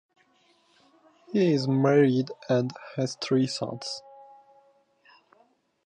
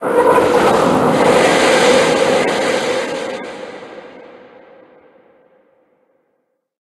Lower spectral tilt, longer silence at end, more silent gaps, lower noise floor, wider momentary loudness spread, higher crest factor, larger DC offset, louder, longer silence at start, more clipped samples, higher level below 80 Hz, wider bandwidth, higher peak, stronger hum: first, -6.5 dB/octave vs -4 dB/octave; second, 1.65 s vs 2.6 s; neither; about the same, -65 dBFS vs -67 dBFS; second, 12 LU vs 20 LU; about the same, 18 dB vs 16 dB; neither; second, -26 LUFS vs -13 LUFS; first, 1.3 s vs 0 s; neither; second, -74 dBFS vs -50 dBFS; second, 9.8 kHz vs 12.5 kHz; second, -10 dBFS vs 0 dBFS; neither